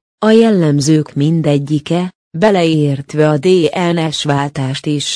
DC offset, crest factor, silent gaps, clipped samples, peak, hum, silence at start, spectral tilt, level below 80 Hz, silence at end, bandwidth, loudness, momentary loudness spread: under 0.1%; 12 dB; 2.15-2.31 s; under 0.1%; 0 dBFS; none; 0.2 s; -6 dB/octave; -54 dBFS; 0 s; 10.5 kHz; -13 LUFS; 7 LU